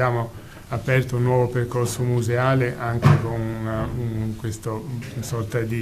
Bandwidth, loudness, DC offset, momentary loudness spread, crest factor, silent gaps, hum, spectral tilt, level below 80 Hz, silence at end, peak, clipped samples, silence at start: 14.5 kHz; -23 LUFS; under 0.1%; 11 LU; 20 dB; none; none; -7 dB/octave; -44 dBFS; 0 s; -2 dBFS; under 0.1%; 0 s